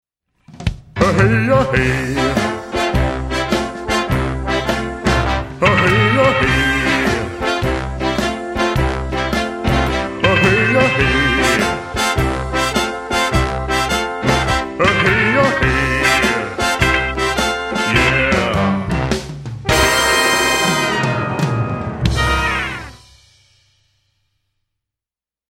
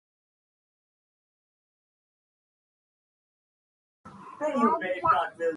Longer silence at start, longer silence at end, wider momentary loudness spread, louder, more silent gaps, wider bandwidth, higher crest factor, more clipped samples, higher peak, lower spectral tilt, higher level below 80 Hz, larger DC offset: second, 0.5 s vs 4.05 s; first, 2.55 s vs 0 s; about the same, 8 LU vs 9 LU; first, -16 LUFS vs -26 LUFS; neither; first, 16.5 kHz vs 11 kHz; second, 16 dB vs 22 dB; neither; first, 0 dBFS vs -10 dBFS; second, -4.5 dB/octave vs -6 dB/octave; first, -28 dBFS vs -68 dBFS; neither